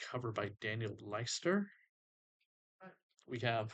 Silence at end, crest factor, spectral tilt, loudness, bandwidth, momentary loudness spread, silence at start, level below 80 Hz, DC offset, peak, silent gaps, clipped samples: 0 s; 18 dB; -4.5 dB/octave; -40 LUFS; 9 kHz; 24 LU; 0 s; -78 dBFS; under 0.1%; -22 dBFS; 1.89-2.79 s, 3.03-3.10 s; under 0.1%